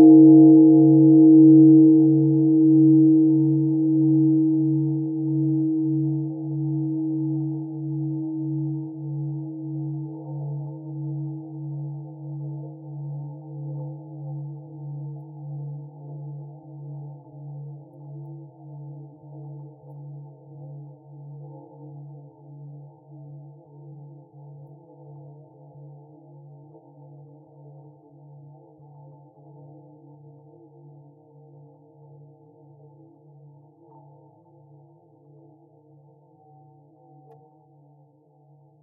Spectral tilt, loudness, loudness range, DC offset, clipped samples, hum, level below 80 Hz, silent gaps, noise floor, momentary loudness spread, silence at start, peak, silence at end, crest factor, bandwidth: -10 dB/octave; -18 LUFS; 28 LU; under 0.1%; under 0.1%; none; -86 dBFS; none; -57 dBFS; 29 LU; 0 s; -4 dBFS; 12.95 s; 18 dB; 1 kHz